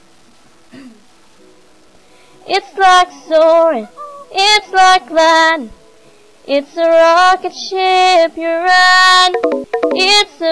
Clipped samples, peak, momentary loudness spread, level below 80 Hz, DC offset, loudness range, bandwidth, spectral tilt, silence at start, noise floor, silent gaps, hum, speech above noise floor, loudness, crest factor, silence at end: under 0.1%; 0 dBFS; 11 LU; -52 dBFS; under 0.1%; 4 LU; 11 kHz; -0.5 dB/octave; 0.85 s; -48 dBFS; none; none; 37 dB; -10 LUFS; 12 dB; 0 s